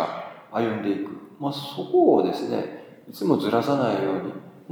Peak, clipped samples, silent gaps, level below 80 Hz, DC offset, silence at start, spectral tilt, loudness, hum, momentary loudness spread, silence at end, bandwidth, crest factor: -6 dBFS; under 0.1%; none; -78 dBFS; under 0.1%; 0 s; -7 dB/octave; -24 LUFS; none; 16 LU; 0 s; 19.5 kHz; 18 dB